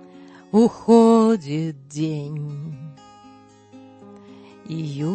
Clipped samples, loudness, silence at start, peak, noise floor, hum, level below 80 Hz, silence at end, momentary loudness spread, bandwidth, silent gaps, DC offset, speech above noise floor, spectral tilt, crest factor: under 0.1%; -20 LUFS; 0.15 s; -2 dBFS; -48 dBFS; none; -66 dBFS; 0 s; 19 LU; 8.8 kHz; none; under 0.1%; 29 dB; -7.5 dB/octave; 20 dB